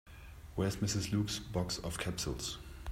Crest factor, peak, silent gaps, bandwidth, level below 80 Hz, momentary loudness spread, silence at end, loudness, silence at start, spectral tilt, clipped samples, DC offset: 16 dB; -22 dBFS; none; 16 kHz; -52 dBFS; 11 LU; 0 s; -37 LUFS; 0.05 s; -4.5 dB/octave; under 0.1%; under 0.1%